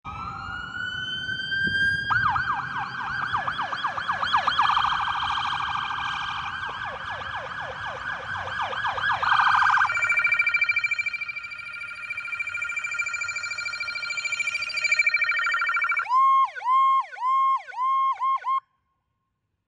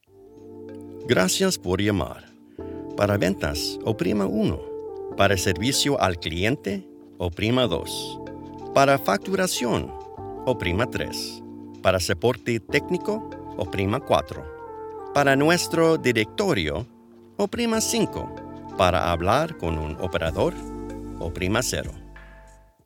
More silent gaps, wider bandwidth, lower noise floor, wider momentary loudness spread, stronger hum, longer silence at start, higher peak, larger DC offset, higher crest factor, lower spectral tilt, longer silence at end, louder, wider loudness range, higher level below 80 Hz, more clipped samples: neither; second, 10 kHz vs 19 kHz; first, -77 dBFS vs -50 dBFS; second, 12 LU vs 17 LU; neither; second, 0.05 s vs 0.2 s; second, -8 dBFS vs -2 dBFS; neither; about the same, 18 dB vs 22 dB; second, -1.5 dB/octave vs -4.5 dB/octave; first, 1.1 s vs 0.35 s; about the same, -24 LUFS vs -24 LUFS; first, 7 LU vs 3 LU; second, -56 dBFS vs -44 dBFS; neither